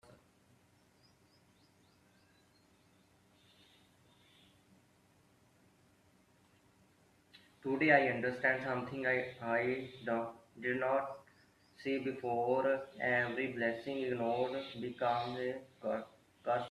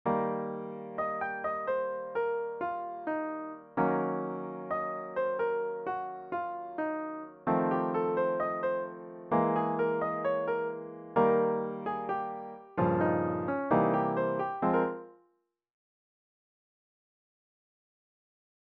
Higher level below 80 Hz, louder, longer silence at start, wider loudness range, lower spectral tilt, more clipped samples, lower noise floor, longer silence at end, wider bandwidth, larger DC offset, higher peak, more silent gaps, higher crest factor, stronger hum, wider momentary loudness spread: second, -78 dBFS vs -70 dBFS; second, -36 LUFS vs -32 LUFS; about the same, 0.1 s vs 0.05 s; about the same, 4 LU vs 4 LU; about the same, -6.5 dB/octave vs -7 dB/octave; neither; second, -69 dBFS vs -75 dBFS; second, 0 s vs 3.65 s; first, 13 kHz vs 4.5 kHz; neither; about the same, -14 dBFS vs -12 dBFS; neither; about the same, 24 dB vs 20 dB; neither; about the same, 10 LU vs 10 LU